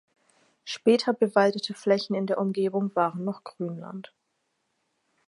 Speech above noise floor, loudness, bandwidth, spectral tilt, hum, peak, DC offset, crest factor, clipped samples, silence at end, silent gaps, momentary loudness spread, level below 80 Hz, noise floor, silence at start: 51 dB; -26 LUFS; 11.5 kHz; -6 dB/octave; none; -6 dBFS; under 0.1%; 22 dB; under 0.1%; 1.25 s; none; 15 LU; -80 dBFS; -77 dBFS; 0.65 s